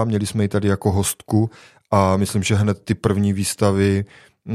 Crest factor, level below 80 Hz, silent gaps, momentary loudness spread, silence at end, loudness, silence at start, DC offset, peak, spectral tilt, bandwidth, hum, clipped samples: 18 dB; -48 dBFS; none; 4 LU; 0 s; -20 LUFS; 0 s; under 0.1%; 0 dBFS; -6 dB/octave; 15 kHz; none; under 0.1%